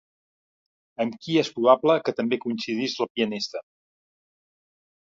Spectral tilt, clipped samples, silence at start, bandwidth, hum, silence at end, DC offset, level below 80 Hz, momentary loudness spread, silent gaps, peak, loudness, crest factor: -5 dB/octave; under 0.1%; 1 s; 7.6 kHz; none; 1.45 s; under 0.1%; -74 dBFS; 12 LU; 3.10-3.15 s; -4 dBFS; -24 LUFS; 24 dB